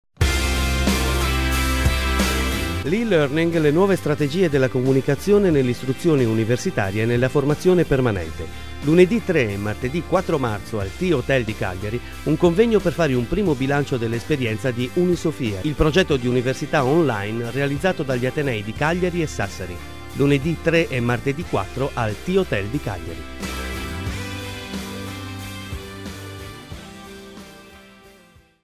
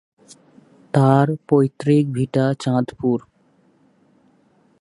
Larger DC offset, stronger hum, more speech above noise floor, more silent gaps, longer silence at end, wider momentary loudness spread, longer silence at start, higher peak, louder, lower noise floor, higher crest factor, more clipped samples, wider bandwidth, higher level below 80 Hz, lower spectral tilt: first, 1% vs under 0.1%; neither; second, 32 dB vs 41 dB; neither; second, 0 s vs 1.6 s; first, 14 LU vs 7 LU; second, 0.05 s vs 0.95 s; about the same, -2 dBFS vs 0 dBFS; about the same, -21 LUFS vs -19 LUFS; second, -52 dBFS vs -59 dBFS; about the same, 18 dB vs 20 dB; neither; first, 16 kHz vs 11.5 kHz; first, -32 dBFS vs -60 dBFS; second, -6 dB/octave vs -8.5 dB/octave